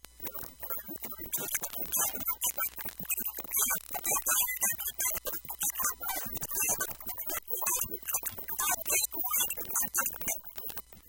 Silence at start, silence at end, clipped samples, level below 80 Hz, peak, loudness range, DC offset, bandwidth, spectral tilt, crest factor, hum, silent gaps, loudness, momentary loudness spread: 0.15 s; 0 s; under 0.1%; -58 dBFS; -12 dBFS; 2 LU; under 0.1%; 17.5 kHz; 0 dB/octave; 20 dB; none; none; -31 LUFS; 9 LU